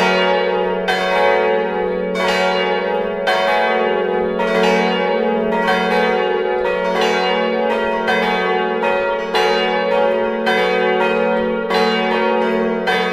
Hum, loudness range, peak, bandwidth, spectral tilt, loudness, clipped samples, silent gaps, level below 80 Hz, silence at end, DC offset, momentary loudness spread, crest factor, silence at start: none; 1 LU; -2 dBFS; 14.5 kHz; -5 dB/octave; -16 LUFS; under 0.1%; none; -50 dBFS; 0 s; under 0.1%; 3 LU; 14 dB; 0 s